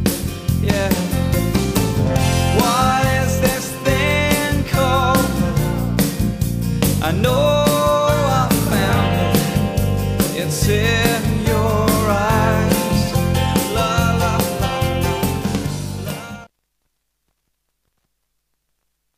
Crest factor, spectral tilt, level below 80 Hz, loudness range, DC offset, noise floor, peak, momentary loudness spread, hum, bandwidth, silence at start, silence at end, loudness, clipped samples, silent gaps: 16 dB; -5 dB/octave; -30 dBFS; 7 LU; under 0.1%; -72 dBFS; 0 dBFS; 5 LU; none; 15.5 kHz; 0 s; 2.75 s; -17 LUFS; under 0.1%; none